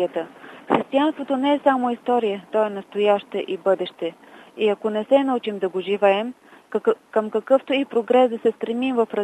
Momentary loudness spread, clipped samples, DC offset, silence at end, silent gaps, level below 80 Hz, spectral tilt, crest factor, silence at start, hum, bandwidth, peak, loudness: 8 LU; under 0.1%; under 0.1%; 0 s; none; -72 dBFS; -6.5 dB/octave; 18 dB; 0 s; none; 10 kHz; -4 dBFS; -22 LUFS